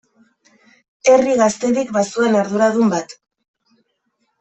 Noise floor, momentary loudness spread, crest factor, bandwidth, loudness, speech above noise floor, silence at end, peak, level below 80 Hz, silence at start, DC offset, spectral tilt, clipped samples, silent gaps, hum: -69 dBFS; 7 LU; 16 dB; 8.4 kHz; -16 LUFS; 54 dB; 1.3 s; -2 dBFS; -62 dBFS; 1.05 s; under 0.1%; -5 dB/octave; under 0.1%; none; none